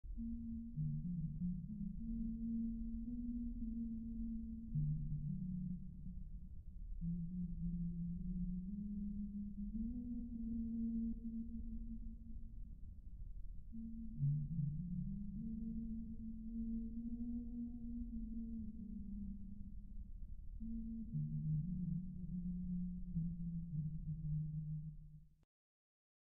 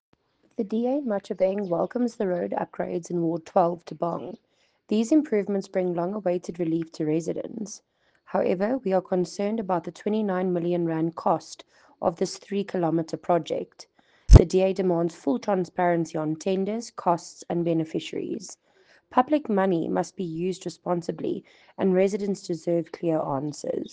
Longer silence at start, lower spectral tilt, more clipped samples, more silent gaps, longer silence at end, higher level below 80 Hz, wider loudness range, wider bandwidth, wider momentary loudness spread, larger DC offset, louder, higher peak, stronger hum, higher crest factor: second, 0.05 s vs 0.6 s; first, -20.5 dB/octave vs -7 dB/octave; neither; neither; first, 0.9 s vs 0.05 s; second, -50 dBFS vs -34 dBFS; about the same, 4 LU vs 5 LU; second, 0.8 kHz vs 9.4 kHz; first, 13 LU vs 9 LU; neither; second, -46 LUFS vs -26 LUFS; second, -30 dBFS vs -2 dBFS; neither; second, 14 dB vs 22 dB